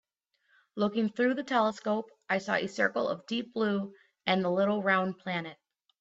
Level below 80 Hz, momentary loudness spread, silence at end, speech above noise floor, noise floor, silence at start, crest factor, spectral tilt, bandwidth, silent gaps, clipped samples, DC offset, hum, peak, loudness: -76 dBFS; 8 LU; 0.5 s; 45 dB; -75 dBFS; 0.75 s; 18 dB; -6 dB/octave; 8 kHz; none; under 0.1%; under 0.1%; none; -12 dBFS; -30 LUFS